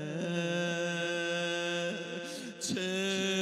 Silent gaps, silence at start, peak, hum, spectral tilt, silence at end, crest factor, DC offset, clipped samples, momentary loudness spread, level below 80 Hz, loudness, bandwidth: none; 0 s; -20 dBFS; none; -3.5 dB/octave; 0 s; 14 dB; under 0.1%; under 0.1%; 7 LU; -78 dBFS; -33 LUFS; 14.5 kHz